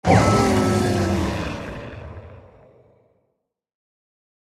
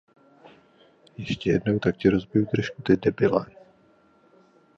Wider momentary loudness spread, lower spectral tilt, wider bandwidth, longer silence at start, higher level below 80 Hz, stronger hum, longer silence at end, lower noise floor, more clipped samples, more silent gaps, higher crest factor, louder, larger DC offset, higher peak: first, 22 LU vs 9 LU; second, -6 dB/octave vs -7.5 dB/octave; first, 15 kHz vs 7.6 kHz; second, 0.05 s vs 1.2 s; first, -40 dBFS vs -52 dBFS; neither; first, 2.1 s vs 1.35 s; first, -76 dBFS vs -59 dBFS; neither; neither; about the same, 20 dB vs 22 dB; first, -20 LUFS vs -24 LUFS; neither; about the same, -2 dBFS vs -4 dBFS